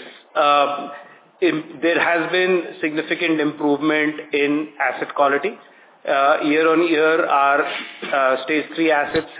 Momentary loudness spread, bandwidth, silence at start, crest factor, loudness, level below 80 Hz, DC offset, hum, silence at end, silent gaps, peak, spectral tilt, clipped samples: 8 LU; 4 kHz; 0 s; 16 dB; -19 LUFS; -64 dBFS; under 0.1%; none; 0 s; none; -2 dBFS; -8 dB/octave; under 0.1%